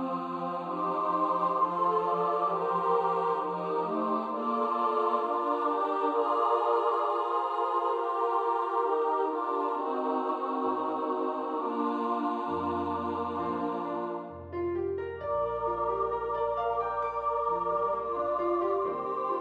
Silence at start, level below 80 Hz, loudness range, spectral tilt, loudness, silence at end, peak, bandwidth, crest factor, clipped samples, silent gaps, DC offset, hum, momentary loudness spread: 0 s; -62 dBFS; 4 LU; -7.5 dB/octave; -30 LUFS; 0 s; -14 dBFS; 8.2 kHz; 14 dB; under 0.1%; none; under 0.1%; none; 5 LU